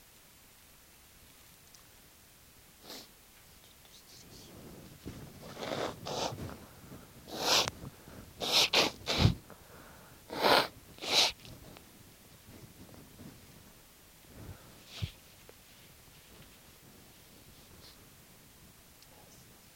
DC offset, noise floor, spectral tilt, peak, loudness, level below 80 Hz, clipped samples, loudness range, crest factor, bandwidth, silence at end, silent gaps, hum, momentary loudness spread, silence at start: under 0.1%; -59 dBFS; -3 dB/octave; -8 dBFS; -30 LUFS; -56 dBFS; under 0.1%; 24 LU; 30 dB; 17 kHz; 1.85 s; none; none; 29 LU; 2.85 s